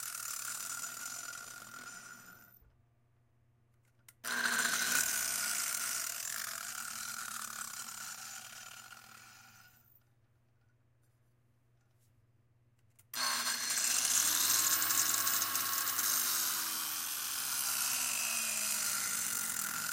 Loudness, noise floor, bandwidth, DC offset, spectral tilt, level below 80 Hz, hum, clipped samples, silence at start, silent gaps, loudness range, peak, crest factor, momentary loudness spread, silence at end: -32 LUFS; -71 dBFS; 17 kHz; under 0.1%; 1.5 dB/octave; -78 dBFS; none; under 0.1%; 0 s; none; 17 LU; -14 dBFS; 24 dB; 18 LU; 0 s